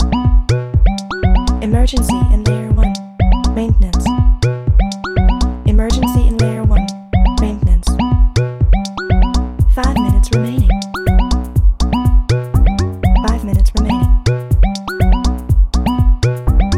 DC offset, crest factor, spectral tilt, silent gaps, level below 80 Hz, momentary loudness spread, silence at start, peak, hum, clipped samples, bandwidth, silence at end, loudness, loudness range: under 0.1%; 12 dB; -6.5 dB/octave; none; -14 dBFS; 3 LU; 0 s; 0 dBFS; none; under 0.1%; 13.5 kHz; 0 s; -15 LUFS; 0 LU